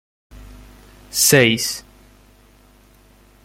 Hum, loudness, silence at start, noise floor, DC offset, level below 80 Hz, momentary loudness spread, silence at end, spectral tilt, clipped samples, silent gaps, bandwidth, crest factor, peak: 50 Hz at -50 dBFS; -15 LUFS; 0.35 s; -51 dBFS; under 0.1%; -48 dBFS; 14 LU; 1.65 s; -3 dB/octave; under 0.1%; none; 16.5 kHz; 20 dB; -2 dBFS